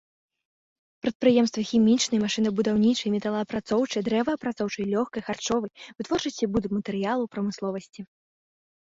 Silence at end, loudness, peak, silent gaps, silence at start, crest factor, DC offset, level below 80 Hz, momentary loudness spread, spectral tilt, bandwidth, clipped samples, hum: 0.8 s; -26 LUFS; -8 dBFS; 1.15-1.20 s; 1.05 s; 18 dB; under 0.1%; -60 dBFS; 11 LU; -5 dB/octave; 8 kHz; under 0.1%; none